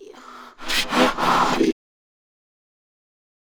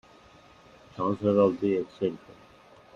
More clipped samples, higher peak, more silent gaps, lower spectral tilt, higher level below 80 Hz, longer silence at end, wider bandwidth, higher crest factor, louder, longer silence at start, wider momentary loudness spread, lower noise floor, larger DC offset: neither; first, -4 dBFS vs -10 dBFS; neither; second, -3 dB/octave vs -8.5 dB/octave; first, -44 dBFS vs -68 dBFS; first, 1.7 s vs 0.8 s; first, over 20 kHz vs 7.2 kHz; about the same, 20 dB vs 20 dB; first, -20 LUFS vs -27 LUFS; second, 0 s vs 0.95 s; about the same, 17 LU vs 16 LU; second, -42 dBFS vs -55 dBFS; neither